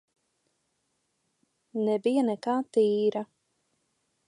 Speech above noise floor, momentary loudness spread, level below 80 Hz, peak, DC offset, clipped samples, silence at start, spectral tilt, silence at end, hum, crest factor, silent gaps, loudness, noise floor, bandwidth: 51 dB; 12 LU; -86 dBFS; -14 dBFS; under 0.1%; under 0.1%; 1.75 s; -6.5 dB/octave; 1.05 s; none; 16 dB; none; -27 LUFS; -77 dBFS; 11 kHz